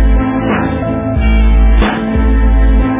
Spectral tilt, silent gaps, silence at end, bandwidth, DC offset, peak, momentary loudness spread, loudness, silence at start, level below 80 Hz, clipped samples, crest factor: -11.5 dB/octave; none; 0 s; 3.8 kHz; under 0.1%; 0 dBFS; 4 LU; -12 LUFS; 0 s; -10 dBFS; under 0.1%; 10 dB